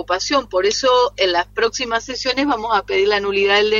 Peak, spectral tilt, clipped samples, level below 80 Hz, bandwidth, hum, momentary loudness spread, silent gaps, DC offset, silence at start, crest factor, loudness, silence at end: -2 dBFS; -2 dB/octave; under 0.1%; -46 dBFS; 7.6 kHz; 50 Hz at -45 dBFS; 5 LU; none; under 0.1%; 0 s; 16 dB; -17 LUFS; 0 s